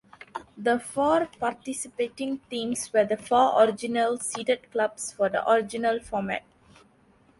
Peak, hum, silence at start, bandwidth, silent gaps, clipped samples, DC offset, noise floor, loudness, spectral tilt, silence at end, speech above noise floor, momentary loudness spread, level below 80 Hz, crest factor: -8 dBFS; none; 0.2 s; 11.5 kHz; none; under 0.1%; under 0.1%; -60 dBFS; -26 LUFS; -3.5 dB/octave; 1 s; 35 dB; 11 LU; -62 dBFS; 20 dB